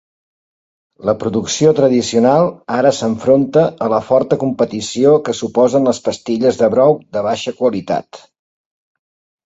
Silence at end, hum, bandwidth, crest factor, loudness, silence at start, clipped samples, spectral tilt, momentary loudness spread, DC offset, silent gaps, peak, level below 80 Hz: 1.3 s; none; 8 kHz; 14 dB; -15 LUFS; 1 s; under 0.1%; -5.5 dB/octave; 8 LU; under 0.1%; none; 0 dBFS; -54 dBFS